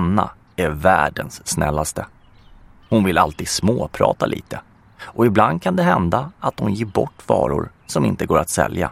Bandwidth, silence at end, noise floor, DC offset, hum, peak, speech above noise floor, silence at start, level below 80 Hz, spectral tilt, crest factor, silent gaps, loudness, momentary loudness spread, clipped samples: 16 kHz; 0 s; -46 dBFS; under 0.1%; none; 0 dBFS; 27 dB; 0 s; -40 dBFS; -5.5 dB/octave; 20 dB; none; -19 LUFS; 11 LU; under 0.1%